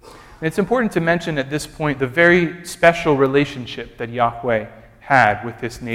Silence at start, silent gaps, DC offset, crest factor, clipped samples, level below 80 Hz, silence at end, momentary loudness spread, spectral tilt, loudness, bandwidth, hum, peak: 0.05 s; none; under 0.1%; 18 dB; under 0.1%; -46 dBFS; 0 s; 14 LU; -5.5 dB/octave; -18 LUFS; 16 kHz; none; 0 dBFS